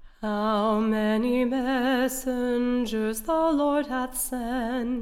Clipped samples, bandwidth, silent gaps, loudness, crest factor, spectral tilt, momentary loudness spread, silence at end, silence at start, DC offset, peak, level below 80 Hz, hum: under 0.1%; 17 kHz; none; -26 LUFS; 12 dB; -4.5 dB/octave; 5 LU; 0 s; 0 s; under 0.1%; -14 dBFS; -46 dBFS; none